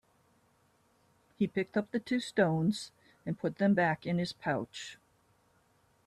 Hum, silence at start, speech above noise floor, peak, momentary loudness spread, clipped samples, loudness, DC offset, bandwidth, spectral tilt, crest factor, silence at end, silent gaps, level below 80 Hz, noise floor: none; 1.4 s; 38 dB; -14 dBFS; 15 LU; under 0.1%; -32 LUFS; under 0.1%; 12 kHz; -6.5 dB/octave; 20 dB; 1.1 s; none; -72 dBFS; -70 dBFS